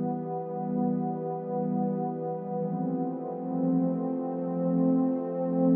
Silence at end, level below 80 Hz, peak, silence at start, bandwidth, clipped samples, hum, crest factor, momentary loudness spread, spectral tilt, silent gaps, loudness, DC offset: 0 s; -82 dBFS; -14 dBFS; 0 s; 2.5 kHz; under 0.1%; none; 14 dB; 7 LU; -13 dB/octave; none; -30 LUFS; under 0.1%